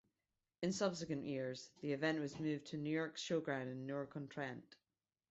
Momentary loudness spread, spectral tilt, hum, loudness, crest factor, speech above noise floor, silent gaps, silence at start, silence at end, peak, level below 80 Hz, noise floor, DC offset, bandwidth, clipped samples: 8 LU; -5 dB/octave; none; -43 LUFS; 18 dB; over 48 dB; none; 0.6 s; 0.55 s; -26 dBFS; -80 dBFS; under -90 dBFS; under 0.1%; 8 kHz; under 0.1%